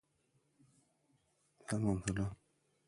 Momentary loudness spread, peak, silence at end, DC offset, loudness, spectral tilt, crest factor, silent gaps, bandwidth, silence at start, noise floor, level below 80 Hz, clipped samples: 9 LU; -22 dBFS; 0.55 s; under 0.1%; -39 LUFS; -6 dB/octave; 20 dB; none; 11.5 kHz; 1.7 s; -78 dBFS; -60 dBFS; under 0.1%